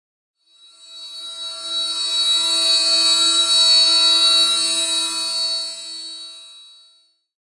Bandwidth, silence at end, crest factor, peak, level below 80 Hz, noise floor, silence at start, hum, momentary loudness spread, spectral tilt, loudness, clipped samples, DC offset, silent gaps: 11.5 kHz; 0.95 s; 16 dB; -4 dBFS; -76 dBFS; -57 dBFS; 0.85 s; none; 20 LU; 3 dB/octave; -14 LUFS; under 0.1%; under 0.1%; none